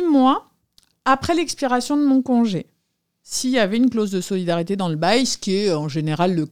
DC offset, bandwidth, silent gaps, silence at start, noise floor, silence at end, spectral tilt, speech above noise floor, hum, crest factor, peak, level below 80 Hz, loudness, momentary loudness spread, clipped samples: 0.5%; 15.5 kHz; none; 0 s; -73 dBFS; 0 s; -5 dB/octave; 54 dB; none; 16 dB; -2 dBFS; -56 dBFS; -20 LUFS; 6 LU; under 0.1%